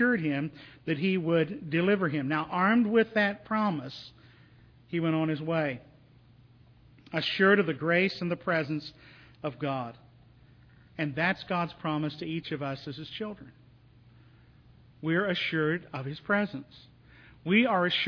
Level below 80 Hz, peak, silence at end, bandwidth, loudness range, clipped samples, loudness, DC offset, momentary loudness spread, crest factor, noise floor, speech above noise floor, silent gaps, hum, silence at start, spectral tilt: -66 dBFS; -8 dBFS; 0 s; 5.4 kHz; 7 LU; under 0.1%; -29 LUFS; under 0.1%; 15 LU; 22 dB; -57 dBFS; 29 dB; none; none; 0 s; -7.5 dB/octave